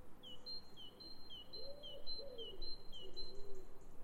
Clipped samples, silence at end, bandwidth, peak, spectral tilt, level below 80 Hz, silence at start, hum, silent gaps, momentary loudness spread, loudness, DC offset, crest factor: under 0.1%; 0 s; 7.4 kHz; -30 dBFS; -4.5 dB/octave; -54 dBFS; 0 s; none; none; 9 LU; -52 LUFS; under 0.1%; 12 dB